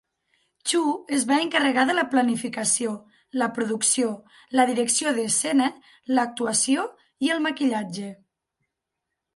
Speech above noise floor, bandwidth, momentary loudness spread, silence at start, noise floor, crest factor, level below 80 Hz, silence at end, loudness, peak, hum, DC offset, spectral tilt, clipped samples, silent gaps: 59 dB; 11.5 kHz; 11 LU; 0.65 s; -83 dBFS; 20 dB; -74 dBFS; 1.2 s; -23 LUFS; -6 dBFS; none; under 0.1%; -2 dB/octave; under 0.1%; none